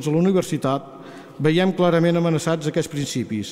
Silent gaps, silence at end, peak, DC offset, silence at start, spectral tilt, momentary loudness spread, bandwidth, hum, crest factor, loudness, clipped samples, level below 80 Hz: none; 0 s; -8 dBFS; under 0.1%; 0 s; -6 dB/octave; 9 LU; 15 kHz; none; 14 dB; -21 LUFS; under 0.1%; -58 dBFS